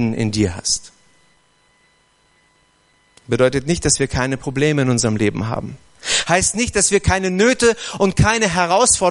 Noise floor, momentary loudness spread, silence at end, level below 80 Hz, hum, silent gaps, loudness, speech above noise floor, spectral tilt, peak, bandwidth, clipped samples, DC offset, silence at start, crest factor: -58 dBFS; 7 LU; 0 s; -36 dBFS; none; none; -17 LUFS; 41 dB; -3.5 dB/octave; 0 dBFS; 11.5 kHz; under 0.1%; under 0.1%; 0 s; 18 dB